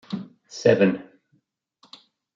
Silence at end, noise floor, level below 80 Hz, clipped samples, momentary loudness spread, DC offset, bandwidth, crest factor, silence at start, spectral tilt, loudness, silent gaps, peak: 1.35 s; -68 dBFS; -68 dBFS; under 0.1%; 17 LU; under 0.1%; 7.6 kHz; 22 dB; 0.1 s; -6.5 dB/octave; -22 LUFS; none; -4 dBFS